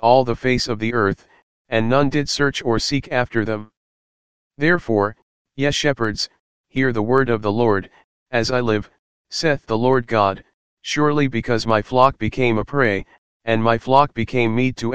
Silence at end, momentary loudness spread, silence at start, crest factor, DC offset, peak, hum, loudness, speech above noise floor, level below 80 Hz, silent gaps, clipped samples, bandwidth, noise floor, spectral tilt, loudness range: 0 s; 9 LU; 0 s; 20 dB; 2%; 0 dBFS; none; -19 LUFS; over 71 dB; -44 dBFS; 1.42-1.65 s, 3.77-4.51 s, 5.22-5.45 s, 6.40-6.64 s, 8.04-8.26 s, 8.99-9.25 s, 10.54-10.77 s, 13.18-13.40 s; under 0.1%; 9.8 kHz; under -90 dBFS; -5.5 dB/octave; 3 LU